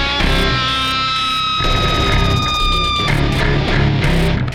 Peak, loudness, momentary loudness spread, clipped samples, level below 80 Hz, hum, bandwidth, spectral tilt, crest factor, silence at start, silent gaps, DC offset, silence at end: -2 dBFS; -15 LUFS; 1 LU; under 0.1%; -22 dBFS; none; 14.5 kHz; -5 dB/octave; 12 dB; 0 s; none; under 0.1%; 0 s